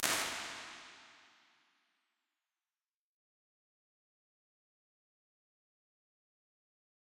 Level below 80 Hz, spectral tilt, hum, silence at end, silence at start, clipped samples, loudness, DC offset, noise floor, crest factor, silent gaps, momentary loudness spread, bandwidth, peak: -80 dBFS; 0 dB/octave; none; 5.9 s; 0 s; under 0.1%; -38 LUFS; under 0.1%; under -90 dBFS; 42 dB; none; 23 LU; 16 kHz; -6 dBFS